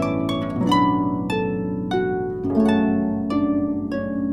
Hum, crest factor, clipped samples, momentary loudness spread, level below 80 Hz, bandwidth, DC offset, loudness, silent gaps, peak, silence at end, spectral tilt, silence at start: none; 14 dB; under 0.1%; 6 LU; -46 dBFS; 12 kHz; under 0.1%; -22 LUFS; none; -6 dBFS; 0 s; -7.5 dB/octave; 0 s